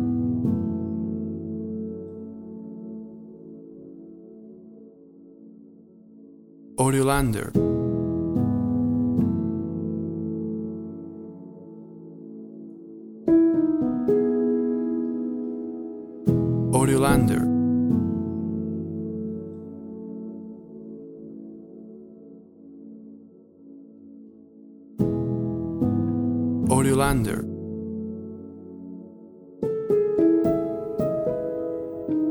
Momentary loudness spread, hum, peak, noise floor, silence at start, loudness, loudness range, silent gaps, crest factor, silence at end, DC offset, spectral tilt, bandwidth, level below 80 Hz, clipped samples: 23 LU; none; -6 dBFS; -50 dBFS; 0 s; -25 LUFS; 19 LU; none; 20 dB; 0 s; under 0.1%; -7 dB/octave; 16 kHz; -46 dBFS; under 0.1%